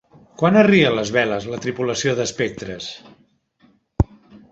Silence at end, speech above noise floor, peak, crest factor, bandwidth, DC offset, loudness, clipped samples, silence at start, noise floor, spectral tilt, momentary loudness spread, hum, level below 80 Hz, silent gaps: 0.45 s; 41 dB; -2 dBFS; 18 dB; 8 kHz; under 0.1%; -19 LUFS; under 0.1%; 0.4 s; -59 dBFS; -5 dB/octave; 17 LU; none; -38 dBFS; none